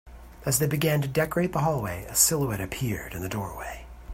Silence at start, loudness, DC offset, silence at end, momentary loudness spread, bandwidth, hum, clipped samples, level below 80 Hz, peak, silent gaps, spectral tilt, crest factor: 0.05 s; -26 LUFS; under 0.1%; 0 s; 14 LU; 16.5 kHz; none; under 0.1%; -46 dBFS; -6 dBFS; none; -4 dB/octave; 22 dB